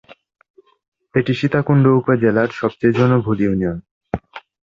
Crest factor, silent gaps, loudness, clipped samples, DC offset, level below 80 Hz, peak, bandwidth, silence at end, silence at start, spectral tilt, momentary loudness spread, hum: 16 dB; 3.91-4.01 s; -17 LUFS; under 0.1%; under 0.1%; -46 dBFS; -2 dBFS; 7.2 kHz; 0.3 s; 1.15 s; -9 dB/octave; 14 LU; none